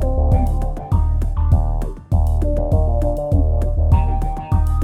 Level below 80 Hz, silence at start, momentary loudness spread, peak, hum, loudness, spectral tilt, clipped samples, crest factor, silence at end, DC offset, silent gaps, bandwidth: -18 dBFS; 0 s; 5 LU; -2 dBFS; none; -19 LUFS; -9.5 dB/octave; under 0.1%; 14 dB; 0 s; under 0.1%; none; 9 kHz